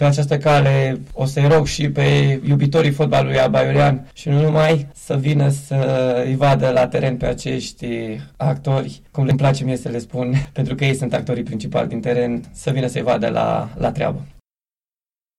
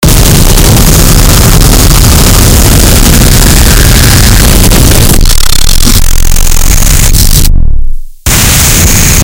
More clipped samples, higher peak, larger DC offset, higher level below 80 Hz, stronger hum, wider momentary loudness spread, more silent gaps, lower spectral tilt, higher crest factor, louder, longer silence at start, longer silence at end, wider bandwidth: second, under 0.1% vs 30%; second, -8 dBFS vs 0 dBFS; neither; second, -42 dBFS vs -4 dBFS; neither; first, 9 LU vs 5 LU; neither; first, -7 dB/octave vs -3.5 dB/octave; first, 10 dB vs 2 dB; second, -18 LUFS vs -4 LUFS; about the same, 0 s vs 0 s; first, 1.1 s vs 0 s; second, 12 kHz vs over 20 kHz